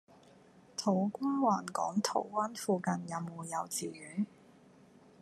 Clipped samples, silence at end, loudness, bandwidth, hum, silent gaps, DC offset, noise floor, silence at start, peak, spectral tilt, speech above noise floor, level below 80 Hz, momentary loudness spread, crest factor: under 0.1%; 0.95 s; -35 LUFS; 13.5 kHz; none; none; under 0.1%; -60 dBFS; 0.55 s; -14 dBFS; -5 dB/octave; 26 dB; -82 dBFS; 9 LU; 20 dB